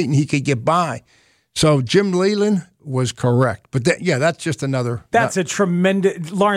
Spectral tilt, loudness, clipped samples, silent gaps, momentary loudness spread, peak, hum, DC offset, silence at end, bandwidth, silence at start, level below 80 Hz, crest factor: -5.5 dB/octave; -18 LUFS; under 0.1%; none; 6 LU; -2 dBFS; none; under 0.1%; 0 s; 14.5 kHz; 0 s; -50 dBFS; 16 dB